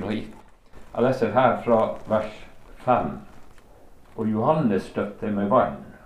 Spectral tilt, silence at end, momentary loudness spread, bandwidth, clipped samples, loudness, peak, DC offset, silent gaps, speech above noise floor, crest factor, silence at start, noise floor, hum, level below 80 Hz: -8 dB/octave; 0.1 s; 13 LU; 12 kHz; under 0.1%; -24 LUFS; -4 dBFS; under 0.1%; none; 25 dB; 20 dB; 0 s; -48 dBFS; none; -50 dBFS